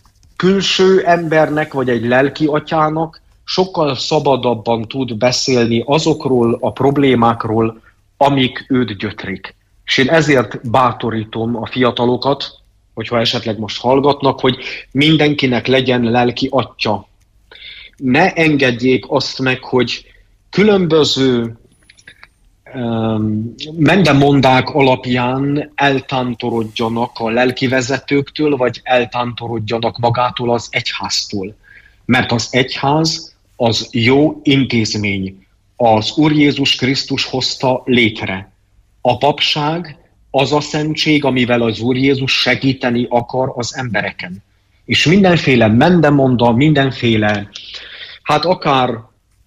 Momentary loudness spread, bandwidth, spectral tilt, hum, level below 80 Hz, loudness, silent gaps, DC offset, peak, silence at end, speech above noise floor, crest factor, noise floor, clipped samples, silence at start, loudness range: 11 LU; 12 kHz; -5.5 dB/octave; none; -46 dBFS; -14 LUFS; none; under 0.1%; 0 dBFS; 0.45 s; 39 dB; 14 dB; -53 dBFS; under 0.1%; 0.4 s; 3 LU